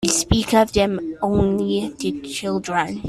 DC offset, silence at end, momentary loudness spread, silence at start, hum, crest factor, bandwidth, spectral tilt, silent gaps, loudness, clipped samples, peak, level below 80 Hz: under 0.1%; 0 s; 9 LU; 0 s; none; 18 dB; 14.5 kHz; -4.5 dB/octave; none; -20 LUFS; under 0.1%; -2 dBFS; -36 dBFS